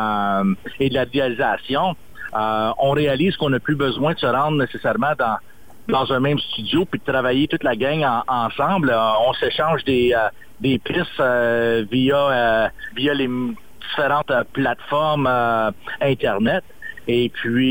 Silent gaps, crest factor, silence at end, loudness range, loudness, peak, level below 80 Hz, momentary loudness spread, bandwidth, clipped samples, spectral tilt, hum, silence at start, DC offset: none; 12 dB; 0 s; 2 LU; -20 LUFS; -8 dBFS; -50 dBFS; 6 LU; 17 kHz; under 0.1%; -7 dB/octave; none; 0 s; 1%